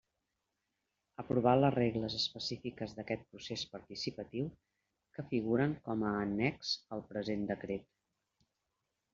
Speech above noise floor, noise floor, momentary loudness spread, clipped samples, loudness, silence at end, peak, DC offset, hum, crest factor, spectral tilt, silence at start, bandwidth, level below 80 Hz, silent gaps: 51 dB; -86 dBFS; 13 LU; under 0.1%; -36 LUFS; 1.3 s; -14 dBFS; under 0.1%; none; 24 dB; -4.5 dB/octave; 1.2 s; 7.4 kHz; -66 dBFS; none